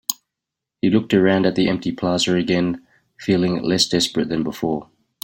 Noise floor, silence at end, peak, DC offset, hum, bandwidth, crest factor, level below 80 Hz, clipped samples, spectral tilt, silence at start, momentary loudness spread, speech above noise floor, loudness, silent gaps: -84 dBFS; 0.4 s; -2 dBFS; under 0.1%; none; 16.5 kHz; 20 dB; -54 dBFS; under 0.1%; -5 dB/octave; 0.1 s; 9 LU; 65 dB; -20 LUFS; none